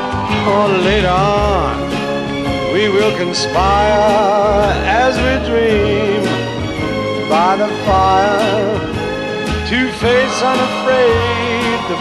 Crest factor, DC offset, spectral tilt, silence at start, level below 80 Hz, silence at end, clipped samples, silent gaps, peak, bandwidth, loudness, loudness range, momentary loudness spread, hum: 12 dB; under 0.1%; -5 dB/octave; 0 s; -30 dBFS; 0 s; under 0.1%; none; 0 dBFS; 12.5 kHz; -14 LUFS; 2 LU; 7 LU; none